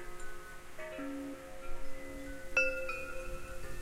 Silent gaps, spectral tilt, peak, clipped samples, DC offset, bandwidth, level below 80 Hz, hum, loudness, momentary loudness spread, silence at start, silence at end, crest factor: none; -4 dB/octave; -18 dBFS; under 0.1%; 0.1%; 15.5 kHz; -46 dBFS; none; -39 LUFS; 17 LU; 0 s; 0 s; 20 dB